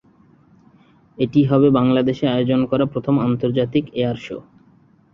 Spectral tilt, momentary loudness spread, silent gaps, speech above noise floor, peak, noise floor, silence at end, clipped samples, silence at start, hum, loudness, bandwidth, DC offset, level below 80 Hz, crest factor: -9 dB/octave; 10 LU; none; 36 dB; -2 dBFS; -53 dBFS; 0.75 s; under 0.1%; 1.2 s; none; -18 LUFS; 6.6 kHz; under 0.1%; -54 dBFS; 16 dB